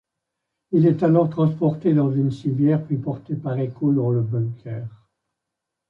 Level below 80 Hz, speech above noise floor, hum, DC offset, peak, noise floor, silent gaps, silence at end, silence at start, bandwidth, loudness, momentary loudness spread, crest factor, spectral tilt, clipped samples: -62 dBFS; 62 dB; none; under 0.1%; -6 dBFS; -83 dBFS; none; 1 s; 0.7 s; 5.4 kHz; -21 LUFS; 10 LU; 16 dB; -11 dB/octave; under 0.1%